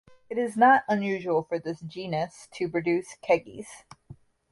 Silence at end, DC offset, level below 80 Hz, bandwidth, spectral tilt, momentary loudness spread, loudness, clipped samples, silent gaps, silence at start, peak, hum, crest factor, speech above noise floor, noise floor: 0.4 s; under 0.1%; -66 dBFS; 11.5 kHz; -6 dB/octave; 16 LU; -26 LUFS; under 0.1%; none; 0.3 s; -8 dBFS; none; 18 dB; 25 dB; -51 dBFS